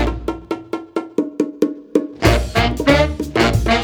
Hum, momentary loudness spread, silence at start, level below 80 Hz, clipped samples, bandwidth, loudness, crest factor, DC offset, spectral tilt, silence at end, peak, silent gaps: none; 11 LU; 0 s; -26 dBFS; under 0.1%; 20 kHz; -18 LUFS; 18 dB; under 0.1%; -5.5 dB/octave; 0 s; 0 dBFS; none